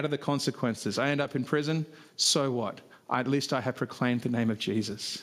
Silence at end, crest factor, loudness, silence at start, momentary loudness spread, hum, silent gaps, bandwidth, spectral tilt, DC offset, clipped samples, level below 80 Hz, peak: 0 s; 18 dB; -29 LUFS; 0 s; 8 LU; none; none; 15.5 kHz; -4 dB/octave; under 0.1%; under 0.1%; -74 dBFS; -12 dBFS